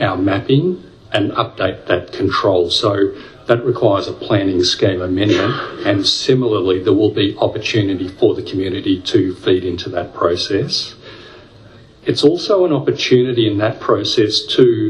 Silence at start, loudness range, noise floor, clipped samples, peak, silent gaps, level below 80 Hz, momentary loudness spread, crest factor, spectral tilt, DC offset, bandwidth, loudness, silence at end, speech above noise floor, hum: 0 s; 3 LU; -42 dBFS; under 0.1%; 0 dBFS; none; -52 dBFS; 7 LU; 16 dB; -5.5 dB/octave; under 0.1%; 11 kHz; -16 LUFS; 0 s; 27 dB; none